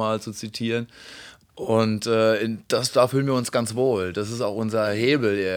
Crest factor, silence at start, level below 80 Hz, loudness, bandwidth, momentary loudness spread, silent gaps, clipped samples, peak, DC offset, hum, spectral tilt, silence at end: 18 dB; 0 s; -64 dBFS; -23 LUFS; 19.5 kHz; 12 LU; none; under 0.1%; -4 dBFS; under 0.1%; none; -5 dB/octave; 0 s